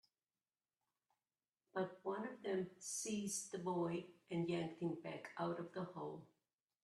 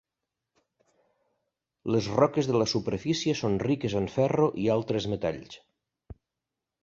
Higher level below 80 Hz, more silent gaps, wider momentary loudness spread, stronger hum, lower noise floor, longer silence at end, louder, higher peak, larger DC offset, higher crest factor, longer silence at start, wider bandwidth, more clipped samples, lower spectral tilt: second, -86 dBFS vs -56 dBFS; neither; about the same, 7 LU vs 7 LU; neither; about the same, under -90 dBFS vs -87 dBFS; about the same, 0.6 s vs 0.7 s; second, -45 LUFS vs -27 LUFS; second, -28 dBFS vs -8 dBFS; neither; about the same, 18 dB vs 22 dB; about the same, 1.75 s vs 1.85 s; first, 13 kHz vs 7.8 kHz; neither; second, -4.5 dB/octave vs -6 dB/octave